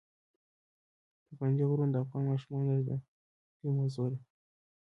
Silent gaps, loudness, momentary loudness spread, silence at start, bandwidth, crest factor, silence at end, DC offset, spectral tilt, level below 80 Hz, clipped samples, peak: 3.08-3.60 s; -33 LUFS; 9 LU; 1.3 s; 6 kHz; 16 dB; 0.65 s; under 0.1%; -10.5 dB/octave; -72 dBFS; under 0.1%; -20 dBFS